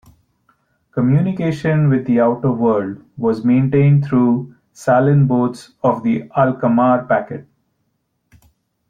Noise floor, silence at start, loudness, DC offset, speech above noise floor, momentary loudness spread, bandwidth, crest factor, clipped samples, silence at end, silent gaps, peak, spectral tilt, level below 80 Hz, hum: -69 dBFS; 0.95 s; -16 LUFS; under 0.1%; 53 dB; 9 LU; 9.4 kHz; 14 dB; under 0.1%; 1.45 s; none; -2 dBFS; -9.5 dB/octave; -54 dBFS; none